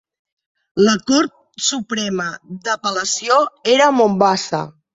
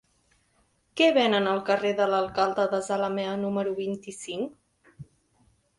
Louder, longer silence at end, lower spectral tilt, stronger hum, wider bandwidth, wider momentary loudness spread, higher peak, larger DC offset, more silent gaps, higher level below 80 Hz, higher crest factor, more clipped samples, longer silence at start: first, -17 LUFS vs -26 LUFS; second, 0.25 s vs 0.75 s; about the same, -3.5 dB/octave vs -4.5 dB/octave; neither; second, 7.8 kHz vs 11.5 kHz; second, 10 LU vs 13 LU; first, 0 dBFS vs -10 dBFS; neither; neither; first, -60 dBFS vs -66 dBFS; about the same, 18 dB vs 18 dB; neither; second, 0.75 s vs 0.95 s